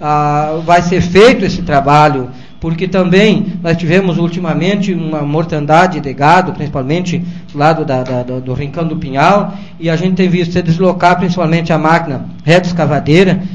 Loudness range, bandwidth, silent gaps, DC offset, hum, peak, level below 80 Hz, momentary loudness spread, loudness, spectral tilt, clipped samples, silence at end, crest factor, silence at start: 4 LU; 9.6 kHz; none; 3%; none; 0 dBFS; -36 dBFS; 10 LU; -12 LUFS; -6.5 dB/octave; 0.5%; 0 s; 12 dB; 0 s